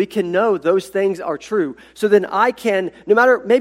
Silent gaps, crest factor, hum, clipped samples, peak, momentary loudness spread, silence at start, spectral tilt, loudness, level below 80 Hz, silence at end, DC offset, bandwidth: none; 16 dB; none; under 0.1%; 0 dBFS; 8 LU; 0 s; -5.5 dB/octave; -17 LUFS; -62 dBFS; 0 s; under 0.1%; 15 kHz